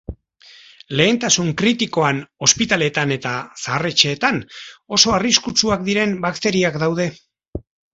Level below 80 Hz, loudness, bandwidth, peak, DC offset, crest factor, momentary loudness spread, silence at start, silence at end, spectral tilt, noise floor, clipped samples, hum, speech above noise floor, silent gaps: -46 dBFS; -17 LUFS; 8 kHz; 0 dBFS; under 0.1%; 20 dB; 12 LU; 0.1 s; 0.35 s; -3 dB/octave; -47 dBFS; under 0.1%; none; 29 dB; 7.48-7.53 s